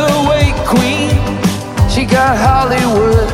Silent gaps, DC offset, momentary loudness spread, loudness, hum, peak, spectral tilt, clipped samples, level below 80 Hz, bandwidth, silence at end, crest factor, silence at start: none; under 0.1%; 5 LU; -12 LUFS; none; 0 dBFS; -5.5 dB/octave; under 0.1%; -22 dBFS; 16.5 kHz; 0 s; 12 dB; 0 s